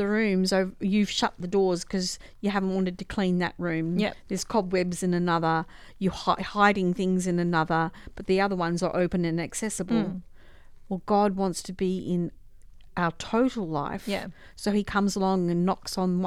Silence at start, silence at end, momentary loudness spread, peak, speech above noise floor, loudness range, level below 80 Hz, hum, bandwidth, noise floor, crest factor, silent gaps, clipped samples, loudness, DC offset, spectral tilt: 0 s; 0 s; 8 LU; -6 dBFS; 21 dB; 4 LU; -50 dBFS; none; 14 kHz; -47 dBFS; 20 dB; none; under 0.1%; -27 LUFS; under 0.1%; -5.5 dB/octave